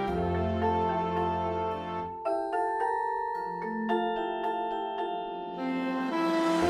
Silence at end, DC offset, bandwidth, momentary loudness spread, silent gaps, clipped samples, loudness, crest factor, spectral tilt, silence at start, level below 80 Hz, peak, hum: 0 s; under 0.1%; 13 kHz; 6 LU; none; under 0.1%; -31 LUFS; 14 dB; -6.5 dB/octave; 0 s; -52 dBFS; -16 dBFS; none